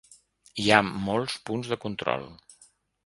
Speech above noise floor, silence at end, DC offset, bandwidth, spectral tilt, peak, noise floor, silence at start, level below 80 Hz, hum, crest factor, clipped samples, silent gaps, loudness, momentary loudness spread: 34 dB; 0.7 s; under 0.1%; 11.5 kHz; -4.5 dB/octave; 0 dBFS; -61 dBFS; 0.55 s; -58 dBFS; none; 28 dB; under 0.1%; none; -26 LUFS; 13 LU